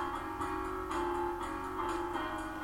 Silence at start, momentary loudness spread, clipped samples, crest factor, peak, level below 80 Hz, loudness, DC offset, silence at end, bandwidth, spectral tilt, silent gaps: 0 s; 3 LU; under 0.1%; 14 dB; -24 dBFS; -52 dBFS; -37 LUFS; under 0.1%; 0 s; 16.5 kHz; -5 dB/octave; none